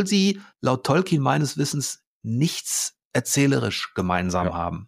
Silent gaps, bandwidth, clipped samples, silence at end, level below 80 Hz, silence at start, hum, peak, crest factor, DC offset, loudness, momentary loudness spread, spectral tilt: 2.07-2.21 s, 3.05-3.11 s; 15.5 kHz; under 0.1%; 0 s; -52 dBFS; 0 s; none; -6 dBFS; 16 dB; under 0.1%; -23 LUFS; 7 LU; -4.5 dB/octave